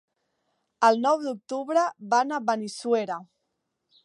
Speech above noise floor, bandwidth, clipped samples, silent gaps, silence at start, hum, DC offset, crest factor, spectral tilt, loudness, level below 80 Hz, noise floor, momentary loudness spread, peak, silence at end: 54 dB; 11.5 kHz; under 0.1%; none; 0.8 s; none; under 0.1%; 20 dB; -4 dB/octave; -25 LUFS; -84 dBFS; -79 dBFS; 11 LU; -8 dBFS; 0.8 s